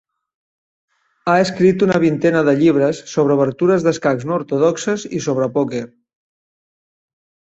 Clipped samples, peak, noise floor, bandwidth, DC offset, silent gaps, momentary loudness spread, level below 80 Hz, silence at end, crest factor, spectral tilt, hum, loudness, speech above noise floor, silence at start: under 0.1%; -2 dBFS; under -90 dBFS; 8.2 kHz; under 0.1%; none; 8 LU; -58 dBFS; 1.7 s; 16 dB; -6.5 dB/octave; none; -16 LUFS; over 74 dB; 1.25 s